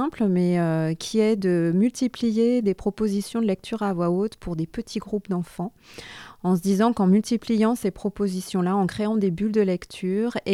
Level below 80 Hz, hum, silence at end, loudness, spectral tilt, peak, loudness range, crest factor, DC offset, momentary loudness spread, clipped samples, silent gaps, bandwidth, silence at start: -52 dBFS; none; 0 s; -24 LUFS; -7 dB/octave; -8 dBFS; 4 LU; 14 dB; under 0.1%; 9 LU; under 0.1%; none; 14 kHz; 0 s